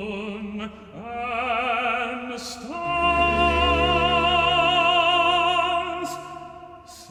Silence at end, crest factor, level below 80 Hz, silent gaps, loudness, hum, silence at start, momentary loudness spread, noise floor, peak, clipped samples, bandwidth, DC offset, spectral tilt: 0 s; 16 dB; -40 dBFS; none; -21 LUFS; none; 0 s; 17 LU; -43 dBFS; -8 dBFS; under 0.1%; 14 kHz; under 0.1%; -4 dB/octave